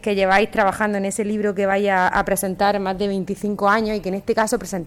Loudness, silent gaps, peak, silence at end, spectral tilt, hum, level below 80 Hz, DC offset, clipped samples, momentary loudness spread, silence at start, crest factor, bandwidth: -20 LUFS; none; -4 dBFS; 0 s; -4.5 dB/octave; none; -44 dBFS; under 0.1%; under 0.1%; 7 LU; 0.05 s; 16 dB; 16.5 kHz